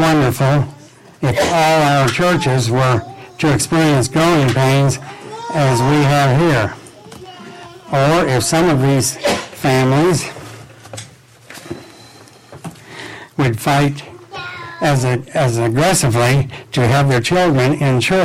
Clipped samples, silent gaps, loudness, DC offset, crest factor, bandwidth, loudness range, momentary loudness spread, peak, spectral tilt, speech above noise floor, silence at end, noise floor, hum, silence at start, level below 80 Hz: under 0.1%; none; -14 LUFS; under 0.1%; 10 dB; 16 kHz; 8 LU; 20 LU; -6 dBFS; -5.5 dB/octave; 28 dB; 0 s; -41 dBFS; none; 0 s; -42 dBFS